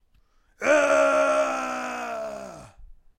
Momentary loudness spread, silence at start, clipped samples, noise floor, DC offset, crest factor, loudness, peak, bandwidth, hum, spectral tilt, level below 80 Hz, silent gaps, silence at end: 16 LU; 0.6 s; under 0.1%; -62 dBFS; under 0.1%; 18 dB; -23 LUFS; -6 dBFS; 14.5 kHz; none; -2.5 dB/octave; -56 dBFS; none; 0.25 s